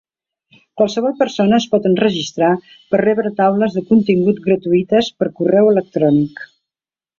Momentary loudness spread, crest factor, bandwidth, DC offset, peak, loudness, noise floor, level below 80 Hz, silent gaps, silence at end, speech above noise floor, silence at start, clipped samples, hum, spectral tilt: 6 LU; 14 dB; 7.2 kHz; under 0.1%; -2 dBFS; -15 LUFS; under -90 dBFS; -56 dBFS; none; 0.75 s; over 75 dB; 0.75 s; under 0.1%; none; -6.5 dB/octave